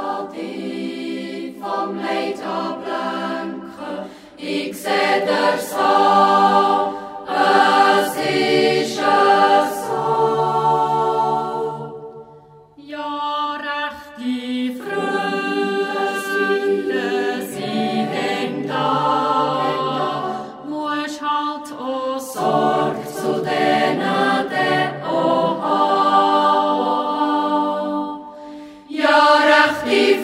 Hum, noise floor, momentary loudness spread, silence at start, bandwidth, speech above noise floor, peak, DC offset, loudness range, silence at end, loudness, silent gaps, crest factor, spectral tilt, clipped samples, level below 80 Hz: none; -45 dBFS; 14 LU; 0 s; 16 kHz; 28 dB; -2 dBFS; under 0.1%; 9 LU; 0 s; -18 LUFS; none; 18 dB; -4.5 dB/octave; under 0.1%; -64 dBFS